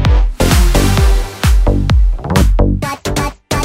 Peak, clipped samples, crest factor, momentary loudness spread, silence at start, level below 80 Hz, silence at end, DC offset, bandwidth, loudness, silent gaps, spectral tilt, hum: 0 dBFS; under 0.1%; 10 dB; 7 LU; 0 s; -12 dBFS; 0 s; under 0.1%; 16.5 kHz; -14 LUFS; none; -5.5 dB/octave; none